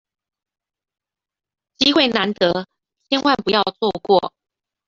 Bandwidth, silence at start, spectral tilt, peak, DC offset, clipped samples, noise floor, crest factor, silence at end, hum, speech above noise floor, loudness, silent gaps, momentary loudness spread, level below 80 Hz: 7.6 kHz; 1.8 s; -4.5 dB/octave; -2 dBFS; under 0.1%; under 0.1%; -89 dBFS; 20 dB; 0.6 s; none; 71 dB; -18 LUFS; none; 8 LU; -60 dBFS